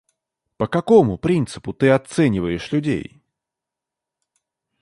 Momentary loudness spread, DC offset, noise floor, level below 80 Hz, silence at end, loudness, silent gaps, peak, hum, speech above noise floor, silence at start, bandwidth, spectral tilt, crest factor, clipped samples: 12 LU; under 0.1%; -85 dBFS; -48 dBFS; 1.8 s; -19 LUFS; none; -2 dBFS; none; 67 dB; 0.6 s; 11.5 kHz; -7 dB/octave; 18 dB; under 0.1%